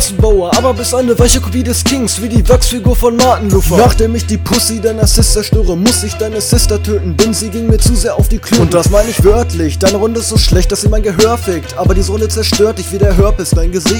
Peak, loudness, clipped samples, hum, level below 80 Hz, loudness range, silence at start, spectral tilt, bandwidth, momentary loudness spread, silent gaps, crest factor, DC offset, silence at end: 0 dBFS; -11 LUFS; 0.9%; none; -16 dBFS; 2 LU; 0 s; -4.5 dB/octave; 19.5 kHz; 5 LU; none; 10 dB; under 0.1%; 0 s